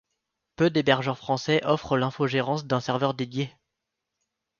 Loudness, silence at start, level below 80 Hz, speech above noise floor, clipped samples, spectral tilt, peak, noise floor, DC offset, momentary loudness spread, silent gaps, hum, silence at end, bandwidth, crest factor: -26 LUFS; 0.6 s; -62 dBFS; 58 dB; under 0.1%; -6 dB/octave; -4 dBFS; -83 dBFS; under 0.1%; 7 LU; none; none; 1.1 s; 7.2 kHz; 22 dB